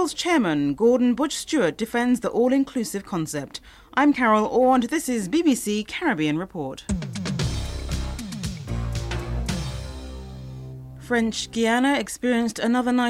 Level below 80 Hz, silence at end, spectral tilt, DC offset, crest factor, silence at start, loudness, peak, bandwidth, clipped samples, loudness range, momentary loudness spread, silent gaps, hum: -38 dBFS; 0 s; -5 dB/octave; under 0.1%; 16 dB; 0 s; -23 LUFS; -6 dBFS; 15 kHz; under 0.1%; 8 LU; 14 LU; none; none